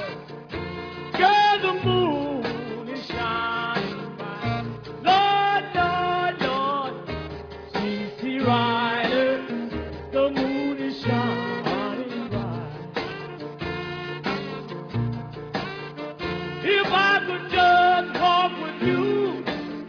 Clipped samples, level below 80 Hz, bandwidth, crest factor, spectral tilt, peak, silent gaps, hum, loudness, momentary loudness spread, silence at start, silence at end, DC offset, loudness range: under 0.1%; -50 dBFS; 5.4 kHz; 18 dB; -6.5 dB/octave; -6 dBFS; none; none; -24 LUFS; 15 LU; 0 s; 0 s; under 0.1%; 9 LU